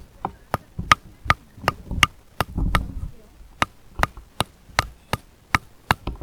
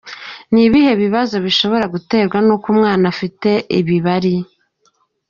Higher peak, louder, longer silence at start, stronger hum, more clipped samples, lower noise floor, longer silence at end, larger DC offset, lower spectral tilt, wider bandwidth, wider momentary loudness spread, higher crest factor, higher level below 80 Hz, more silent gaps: about the same, 0 dBFS vs -2 dBFS; second, -25 LUFS vs -15 LUFS; first, 0.2 s vs 0.05 s; neither; neither; second, -45 dBFS vs -60 dBFS; second, 0.05 s vs 0.85 s; neither; about the same, -3.5 dB/octave vs -4.5 dB/octave; first, over 20 kHz vs 7.2 kHz; first, 11 LU vs 7 LU; first, 26 dB vs 12 dB; first, -36 dBFS vs -50 dBFS; neither